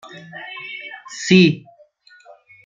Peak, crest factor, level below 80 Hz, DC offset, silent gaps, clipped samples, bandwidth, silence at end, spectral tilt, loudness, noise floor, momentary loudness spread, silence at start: -2 dBFS; 20 dB; -60 dBFS; under 0.1%; none; under 0.1%; 7.6 kHz; 1.1 s; -5.5 dB/octave; -16 LUFS; -51 dBFS; 21 LU; 0.35 s